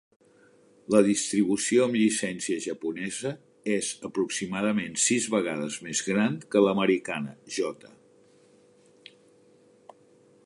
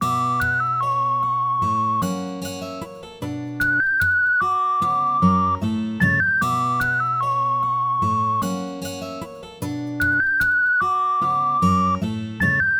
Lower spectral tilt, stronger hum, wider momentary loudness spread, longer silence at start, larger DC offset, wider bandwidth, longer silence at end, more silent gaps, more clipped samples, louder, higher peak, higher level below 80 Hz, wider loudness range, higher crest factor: second, -4 dB/octave vs -5.5 dB/octave; neither; about the same, 11 LU vs 12 LU; first, 0.9 s vs 0 s; neither; second, 11.5 kHz vs over 20 kHz; first, 2.6 s vs 0 s; neither; neither; second, -27 LUFS vs -20 LUFS; about the same, -6 dBFS vs -6 dBFS; second, -70 dBFS vs -50 dBFS; about the same, 6 LU vs 4 LU; first, 22 dB vs 16 dB